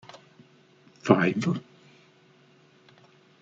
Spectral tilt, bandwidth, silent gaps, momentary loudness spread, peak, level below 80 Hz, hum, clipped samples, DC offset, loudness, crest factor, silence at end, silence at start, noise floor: -7 dB/octave; 7.8 kHz; none; 16 LU; -4 dBFS; -70 dBFS; none; under 0.1%; under 0.1%; -25 LUFS; 26 dB; 1.8 s; 1.05 s; -59 dBFS